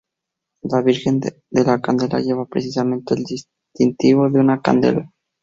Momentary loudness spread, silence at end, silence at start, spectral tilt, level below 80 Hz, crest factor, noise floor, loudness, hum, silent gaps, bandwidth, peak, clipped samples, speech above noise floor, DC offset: 8 LU; 0.35 s; 0.65 s; -7 dB/octave; -56 dBFS; 16 dB; -82 dBFS; -18 LUFS; none; none; 7.6 kHz; -2 dBFS; under 0.1%; 64 dB; under 0.1%